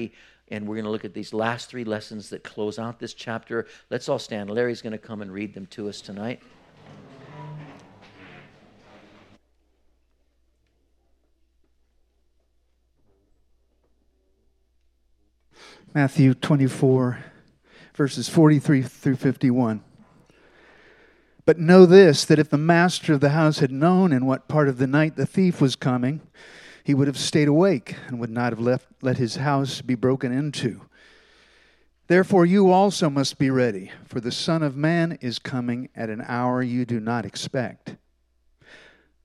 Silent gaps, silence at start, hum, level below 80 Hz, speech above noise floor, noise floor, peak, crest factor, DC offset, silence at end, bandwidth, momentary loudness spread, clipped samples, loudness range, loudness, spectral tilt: none; 0 s; none; -66 dBFS; 45 dB; -66 dBFS; 0 dBFS; 22 dB; under 0.1%; 1.3 s; 13 kHz; 17 LU; under 0.1%; 13 LU; -21 LUFS; -6.5 dB/octave